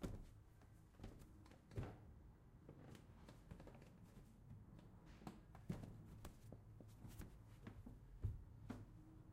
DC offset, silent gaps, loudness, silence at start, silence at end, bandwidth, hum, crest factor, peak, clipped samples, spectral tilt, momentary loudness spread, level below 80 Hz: under 0.1%; none; -60 LUFS; 0 s; 0 s; 15.5 kHz; none; 22 dB; -34 dBFS; under 0.1%; -7 dB/octave; 12 LU; -64 dBFS